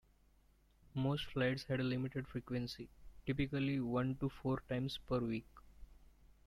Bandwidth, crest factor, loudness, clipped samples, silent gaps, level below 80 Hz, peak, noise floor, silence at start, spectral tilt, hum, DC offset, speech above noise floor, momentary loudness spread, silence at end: 14 kHz; 16 dB; -40 LUFS; under 0.1%; none; -60 dBFS; -24 dBFS; -70 dBFS; 0.95 s; -7.5 dB/octave; none; under 0.1%; 31 dB; 9 LU; 0.2 s